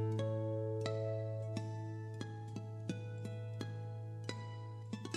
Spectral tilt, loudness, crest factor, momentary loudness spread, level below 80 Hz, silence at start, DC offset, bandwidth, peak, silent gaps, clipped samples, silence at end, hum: -7 dB/octave; -43 LUFS; 18 dB; 8 LU; -82 dBFS; 0 s; under 0.1%; 9.8 kHz; -22 dBFS; none; under 0.1%; 0 s; none